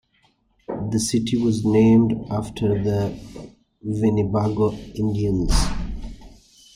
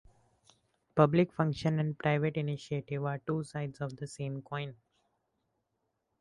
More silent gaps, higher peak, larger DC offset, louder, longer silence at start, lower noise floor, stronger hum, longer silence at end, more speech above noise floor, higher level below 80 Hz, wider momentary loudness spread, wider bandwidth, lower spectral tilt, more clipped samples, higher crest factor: neither; first, -4 dBFS vs -8 dBFS; neither; first, -21 LUFS vs -33 LUFS; second, 0.7 s vs 0.95 s; second, -63 dBFS vs -82 dBFS; neither; second, 0.4 s vs 1.45 s; second, 43 dB vs 50 dB; first, -32 dBFS vs -66 dBFS; first, 18 LU vs 13 LU; first, 15.5 kHz vs 11 kHz; about the same, -6.5 dB/octave vs -7.5 dB/octave; neither; second, 16 dB vs 24 dB